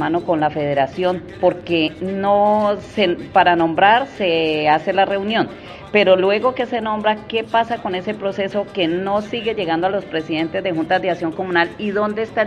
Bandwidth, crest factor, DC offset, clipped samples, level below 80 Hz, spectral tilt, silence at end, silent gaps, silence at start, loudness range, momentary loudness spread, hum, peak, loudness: 9.6 kHz; 18 dB; under 0.1%; under 0.1%; -52 dBFS; -6.5 dB/octave; 0 s; none; 0 s; 5 LU; 8 LU; none; 0 dBFS; -18 LUFS